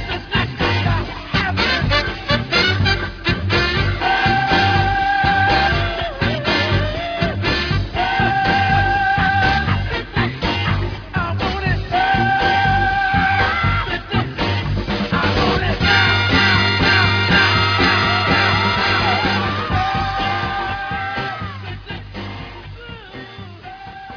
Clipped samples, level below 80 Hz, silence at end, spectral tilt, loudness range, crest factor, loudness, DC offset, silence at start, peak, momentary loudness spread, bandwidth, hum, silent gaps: under 0.1%; -30 dBFS; 0 s; -5.5 dB/octave; 6 LU; 16 dB; -17 LUFS; under 0.1%; 0 s; 0 dBFS; 14 LU; 5.4 kHz; none; none